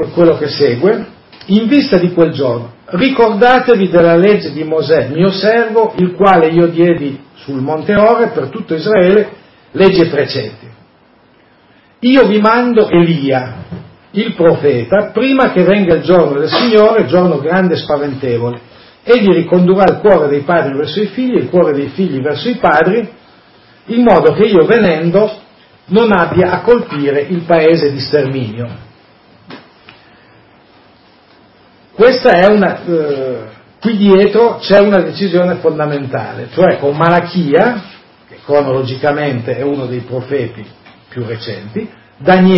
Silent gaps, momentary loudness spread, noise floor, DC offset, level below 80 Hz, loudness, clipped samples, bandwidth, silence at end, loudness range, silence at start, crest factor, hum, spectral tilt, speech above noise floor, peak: none; 13 LU; -47 dBFS; under 0.1%; -46 dBFS; -11 LUFS; 0.2%; 5.8 kHz; 0 s; 5 LU; 0 s; 12 dB; none; -9 dB/octave; 37 dB; 0 dBFS